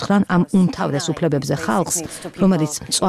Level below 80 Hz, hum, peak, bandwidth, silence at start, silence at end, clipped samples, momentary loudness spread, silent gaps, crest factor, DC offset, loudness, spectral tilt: -48 dBFS; none; -6 dBFS; 14 kHz; 0 s; 0 s; under 0.1%; 5 LU; none; 12 dB; under 0.1%; -19 LUFS; -5 dB/octave